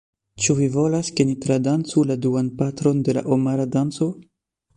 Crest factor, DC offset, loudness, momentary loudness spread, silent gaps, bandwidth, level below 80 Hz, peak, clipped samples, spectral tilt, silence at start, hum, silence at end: 16 dB; under 0.1%; -21 LUFS; 4 LU; none; 11 kHz; -56 dBFS; -4 dBFS; under 0.1%; -6 dB/octave; 0.4 s; none; 0.55 s